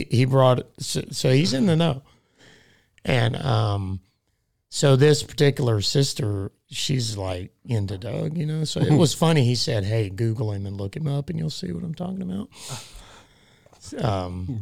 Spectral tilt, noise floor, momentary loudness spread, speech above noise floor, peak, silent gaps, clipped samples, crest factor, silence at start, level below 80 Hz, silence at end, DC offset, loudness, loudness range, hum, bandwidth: -5.5 dB/octave; -72 dBFS; 14 LU; 50 dB; -4 dBFS; none; under 0.1%; 18 dB; 0 s; -54 dBFS; 0 s; 0.4%; -23 LUFS; 8 LU; none; 15.5 kHz